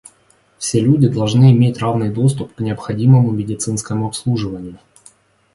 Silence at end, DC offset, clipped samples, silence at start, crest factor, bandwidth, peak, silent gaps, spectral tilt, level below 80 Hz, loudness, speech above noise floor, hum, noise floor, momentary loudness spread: 0.8 s; under 0.1%; under 0.1%; 0.6 s; 16 dB; 11.5 kHz; 0 dBFS; none; -7 dB/octave; -48 dBFS; -16 LUFS; 40 dB; none; -55 dBFS; 12 LU